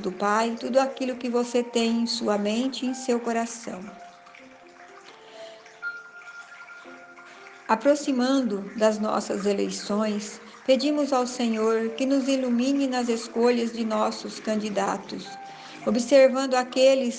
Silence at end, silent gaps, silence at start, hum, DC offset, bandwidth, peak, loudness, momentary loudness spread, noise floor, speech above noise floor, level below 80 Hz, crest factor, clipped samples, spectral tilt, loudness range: 0 s; none; 0 s; none; under 0.1%; 9.8 kHz; -6 dBFS; -25 LUFS; 21 LU; -49 dBFS; 24 dB; -70 dBFS; 20 dB; under 0.1%; -4 dB/octave; 12 LU